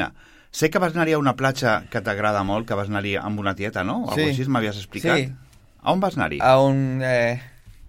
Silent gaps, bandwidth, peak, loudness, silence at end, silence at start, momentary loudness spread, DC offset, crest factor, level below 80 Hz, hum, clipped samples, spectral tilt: none; 16.5 kHz; -4 dBFS; -22 LUFS; 0 s; 0 s; 8 LU; under 0.1%; 18 dB; -48 dBFS; none; under 0.1%; -6 dB/octave